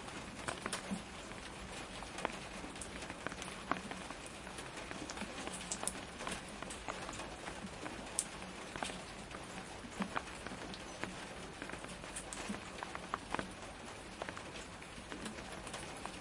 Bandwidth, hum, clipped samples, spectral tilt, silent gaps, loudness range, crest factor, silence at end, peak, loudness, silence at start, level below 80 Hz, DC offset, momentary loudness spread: 11.5 kHz; none; under 0.1%; -3 dB/octave; none; 2 LU; 32 dB; 0 s; -14 dBFS; -44 LUFS; 0 s; -60 dBFS; under 0.1%; 6 LU